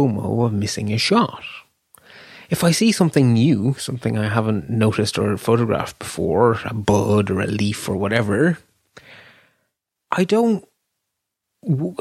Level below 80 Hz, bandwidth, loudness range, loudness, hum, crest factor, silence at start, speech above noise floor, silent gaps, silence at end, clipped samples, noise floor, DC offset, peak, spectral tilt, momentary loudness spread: -52 dBFS; 15.5 kHz; 5 LU; -19 LUFS; none; 18 dB; 0 s; 61 dB; none; 0.05 s; under 0.1%; -79 dBFS; under 0.1%; -2 dBFS; -6 dB/octave; 9 LU